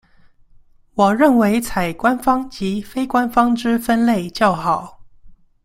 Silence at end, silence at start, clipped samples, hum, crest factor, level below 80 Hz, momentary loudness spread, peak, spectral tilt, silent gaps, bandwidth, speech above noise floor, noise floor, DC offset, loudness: 0.3 s; 0.95 s; under 0.1%; none; 16 dB; -46 dBFS; 10 LU; -2 dBFS; -5.5 dB/octave; none; 16 kHz; 32 dB; -49 dBFS; under 0.1%; -17 LUFS